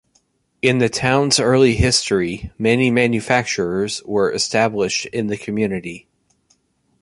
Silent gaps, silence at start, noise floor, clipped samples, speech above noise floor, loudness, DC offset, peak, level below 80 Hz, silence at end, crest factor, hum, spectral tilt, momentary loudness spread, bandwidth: none; 0.65 s; -63 dBFS; under 0.1%; 45 dB; -18 LUFS; under 0.1%; -2 dBFS; -38 dBFS; 1.05 s; 18 dB; none; -4 dB/octave; 9 LU; 11.5 kHz